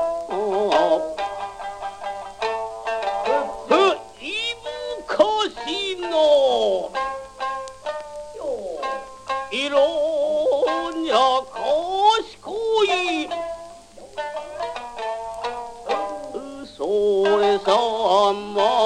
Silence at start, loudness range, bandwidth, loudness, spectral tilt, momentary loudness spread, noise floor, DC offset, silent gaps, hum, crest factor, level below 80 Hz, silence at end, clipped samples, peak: 0 s; 6 LU; 11 kHz; -22 LUFS; -3 dB/octave; 14 LU; -42 dBFS; under 0.1%; none; none; 18 dB; -56 dBFS; 0 s; under 0.1%; -4 dBFS